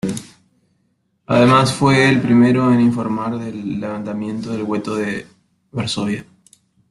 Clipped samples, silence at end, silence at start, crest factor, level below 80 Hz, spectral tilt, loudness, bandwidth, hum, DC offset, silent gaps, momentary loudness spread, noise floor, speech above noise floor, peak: under 0.1%; 0.65 s; 0.05 s; 16 dB; -52 dBFS; -6 dB/octave; -17 LUFS; 12 kHz; none; under 0.1%; none; 13 LU; -65 dBFS; 49 dB; -2 dBFS